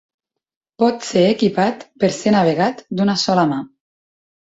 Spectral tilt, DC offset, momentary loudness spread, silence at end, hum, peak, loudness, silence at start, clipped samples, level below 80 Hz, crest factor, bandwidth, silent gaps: -5.5 dB/octave; under 0.1%; 5 LU; 0.9 s; none; -2 dBFS; -17 LUFS; 0.8 s; under 0.1%; -58 dBFS; 16 dB; 8 kHz; none